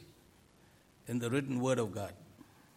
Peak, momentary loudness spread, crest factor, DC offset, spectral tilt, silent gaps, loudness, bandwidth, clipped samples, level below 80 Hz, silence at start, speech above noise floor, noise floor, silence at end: -20 dBFS; 18 LU; 18 dB; under 0.1%; -6 dB/octave; none; -36 LUFS; 16 kHz; under 0.1%; -72 dBFS; 0 s; 30 dB; -64 dBFS; 0.35 s